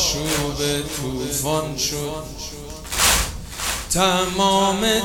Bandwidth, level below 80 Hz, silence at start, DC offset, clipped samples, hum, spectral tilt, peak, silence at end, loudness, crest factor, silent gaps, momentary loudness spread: over 20 kHz; -36 dBFS; 0 s; under 0.1%; under 0.1%; none; -2.5 dB/octave; -4 dBFS; 0 s; -20 LUFS; 18 dB; none; 13 LU